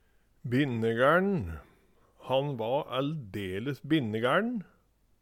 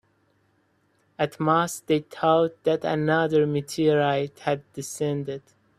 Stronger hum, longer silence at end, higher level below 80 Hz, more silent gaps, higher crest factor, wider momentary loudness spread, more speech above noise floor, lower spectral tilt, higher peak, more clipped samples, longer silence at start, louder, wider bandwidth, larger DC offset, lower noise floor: neither; first, 0.6 s vs 0.4 s; first, -58 dBFS vs -66 dBFS; neither; about the same, 18 dB vs 18 dB; first, 13 LU vs 9 LU; second, 35 dB vs 43 dB; first, -7.5 dB/octave vs -5.5 dB/octave; second, -12 dBFS vs -6 dBFS; neither; second, 0.45 s vs 1.2 s; second, -29 LUFS vs -24 LUFS; about the same, 16.5 kHz vs 15 kHz; neither; about the same, -64 dBFS vs -67 dBFS